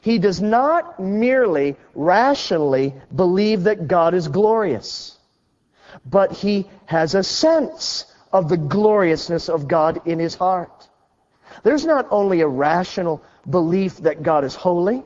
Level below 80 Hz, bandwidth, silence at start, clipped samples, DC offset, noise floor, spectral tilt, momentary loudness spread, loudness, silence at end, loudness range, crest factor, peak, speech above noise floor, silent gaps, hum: -54 dBFS; 7.8 kHz; 0.05 s; under 0.1%; under 0.1%; -65 dBFS; -6 dB/octave; 8 LU; -19 LUFS; 0.05 s; 3 LU; 16 dB; -4 dBFS; 47 dB; none; none